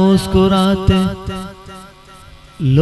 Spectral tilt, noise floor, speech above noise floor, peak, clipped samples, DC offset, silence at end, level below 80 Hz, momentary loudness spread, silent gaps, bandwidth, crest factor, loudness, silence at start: -7 dB/octave; -40 dBFS; 27 dB; 0 dBFS; under 0.1%; under 0.1%; 0 s; -30 dBFS; 22 LU; none; 12.5 kHz; 16 dB; -15 LUFS; 0 s